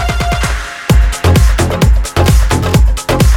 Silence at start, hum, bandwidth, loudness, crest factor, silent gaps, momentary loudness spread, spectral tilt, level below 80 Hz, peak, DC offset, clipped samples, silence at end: 0 s; none; 16.5 kHz; -12 LUFS; 10 dB; none; 4 LU; -5.5 dB/octave; -12 dBFS; 0 dBFS; under 0.1%; under 0.1%; 0 s